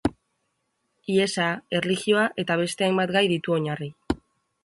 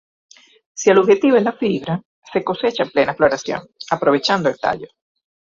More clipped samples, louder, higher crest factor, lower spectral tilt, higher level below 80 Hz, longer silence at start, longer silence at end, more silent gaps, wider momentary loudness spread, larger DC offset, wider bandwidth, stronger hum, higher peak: neither; second, -24 LUFS vs -18 LUFS; about the same, 20 dB vs 16 dB; about the same, -5 dB/octave vs -5 dB/octave; first, -52 dBFS vs -58 dBFS; second, 0.05 s vs 0.75 s; second, 0.5 s vs 0.7 s; second, none vs 2.05-2.22 s; second, 10 LU vs 13 LU; neither; first, 11.5 kHz vs 7.6 kHz; neither; second, -6 dBFS vs -2 dBFS